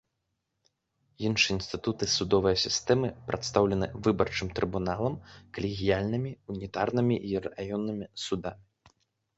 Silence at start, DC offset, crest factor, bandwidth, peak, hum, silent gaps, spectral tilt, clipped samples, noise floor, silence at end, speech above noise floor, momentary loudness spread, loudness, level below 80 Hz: 1.2 s; under 0.1%; 22 dB; 8.2 kHz; -8 dBFS; none; none; -4.5 dB/octave; under 0.1%; -81 dBFS; 0.8 s; 52 dB; 10 LU; -29 LUFS; -52 dBFS